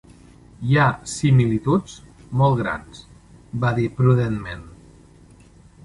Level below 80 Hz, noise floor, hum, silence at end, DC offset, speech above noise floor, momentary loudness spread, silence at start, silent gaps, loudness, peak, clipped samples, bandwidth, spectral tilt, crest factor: -46 dBFS; -49 dBFS; none; 1.15 s; under 0.1%; 29 dB; 16 LU; 0.6 s; none; -20 LUFS; -4 dBFS; under 0.1%; 11.5 kHz; -7 dB/octave; 18 dB